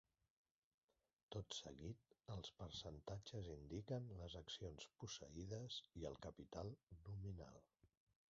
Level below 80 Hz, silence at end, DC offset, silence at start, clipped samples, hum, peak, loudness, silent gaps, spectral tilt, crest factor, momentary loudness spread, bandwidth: -68 dBFS; 0.4 s; under 0.1%; 1.3 s; under 0.1%; none; -36 dBFS; -54 LUFS; 6.83-6.87 s; -5.5 dB/octave; 20 dB; 6 LU; 7.4 kHz